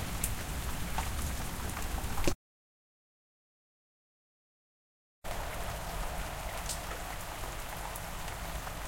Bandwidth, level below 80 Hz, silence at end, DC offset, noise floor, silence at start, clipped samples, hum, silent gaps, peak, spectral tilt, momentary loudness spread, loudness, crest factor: 17 kHz; -42 dBFS; 0 s; under 0.1%; under -90 dBFS; 0 s; under 0.1%; none; 2.35-5.22 s; -12 dBFS; -3.5 dB/octave; 5 LU; -38 LUFS; 26 dB